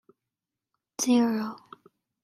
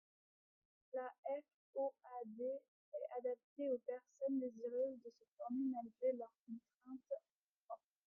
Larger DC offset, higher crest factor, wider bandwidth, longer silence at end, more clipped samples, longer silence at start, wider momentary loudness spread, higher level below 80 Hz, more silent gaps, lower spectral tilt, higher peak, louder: neither; about the same, 18 dB vs 16 dB; first, 14.5 kHz vs 7 kHz; first, 0.65 s vs 0.3 s; neither; about the same, 1 s vs 0.95 s; first, 20 LU vs 14 LU; first, -80 dBFS vs under -90 dBFS; second, none vs 1.18-1.23 s, 1.54-1.73 s, 2.68-2.92 s, 3.44-3.56 s, 5.28-5.37 s, 6.39-6.46 s, 6.74-6.78 s, 7.31-7.69 s; second, -3.5 dB/octave vs -7.5 dB/octave; first, -12 dBFS vs -30 dBFS; first, -26 LUFS vs -46 LUFS